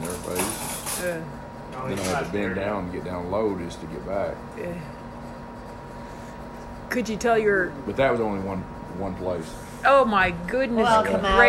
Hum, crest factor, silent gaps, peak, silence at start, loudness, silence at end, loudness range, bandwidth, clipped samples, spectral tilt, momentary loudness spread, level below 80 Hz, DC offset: none; 22 dB; none; -2 dBFS; 0 s; -25 LUFS; 0 s; 9 LU; 16 kHz; under 0.1%; -4.5 dB/octave; 19 LU; -44 dBFS; under 0.1%